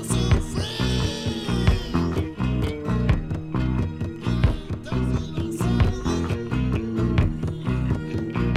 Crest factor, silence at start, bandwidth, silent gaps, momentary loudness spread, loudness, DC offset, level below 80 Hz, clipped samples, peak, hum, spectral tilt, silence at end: 18 dB; 0 s; 14.5 kHz; none; 5 LU; -25 LUFS; under 0.1%; -30 dBFS; under 0.1%; -6 dBFS; none; -6.5 dB/octave; 0 s